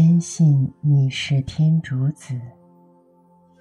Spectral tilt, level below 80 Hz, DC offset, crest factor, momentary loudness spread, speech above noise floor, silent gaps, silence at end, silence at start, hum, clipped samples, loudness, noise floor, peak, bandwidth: -6.5 dB/octave; -52 dBFS; under 0.1%; 12 dB; 12 LU; 35 dB; none; 1.1 s; 0 s; none; under 0.1%; -19 LUFS; -55 dBFS; -8 dBFS; 10.5 kHz